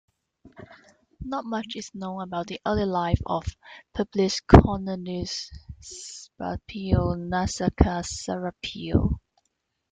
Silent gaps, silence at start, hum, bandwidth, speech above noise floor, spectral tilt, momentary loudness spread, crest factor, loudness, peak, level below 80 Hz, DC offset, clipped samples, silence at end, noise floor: none; 0.45 s; none; 9.4 kHz; 52 dB; -6 dB/octave; 15 LU; 24 dB; -26 LUFS; 0 dBFS; -36 dBFS; under 0.1%; under 0.1%; 0.75 s; -77 dBFS